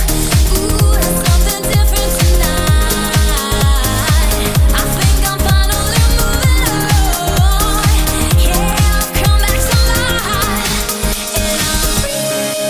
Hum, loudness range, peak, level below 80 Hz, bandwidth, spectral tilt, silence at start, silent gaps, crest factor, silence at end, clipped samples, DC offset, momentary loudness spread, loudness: none; 1 LU; 0 dBFS; -14 dBFS; 16 kHz; -4 dB/octave; 0 s; none; 12 dB; 0 s; under 0.1%; under 0.1%; 2 LU; -13 LUFS